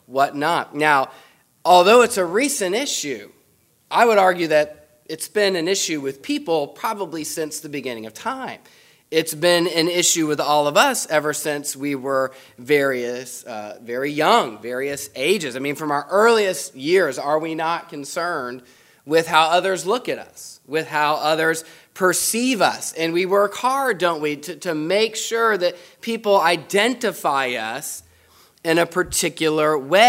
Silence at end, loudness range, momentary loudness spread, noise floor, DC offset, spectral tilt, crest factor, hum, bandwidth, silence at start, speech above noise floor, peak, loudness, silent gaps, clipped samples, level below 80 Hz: 0 s; 5 LU; 13 LU; -60 dBFS; under 0.1%; -3 dB/octave; 20 dB; none; 16 kHz; 0.1 s; 40 dB; 0 dBFS; -20 LUFS; none; under 0.1%; -62 dBFS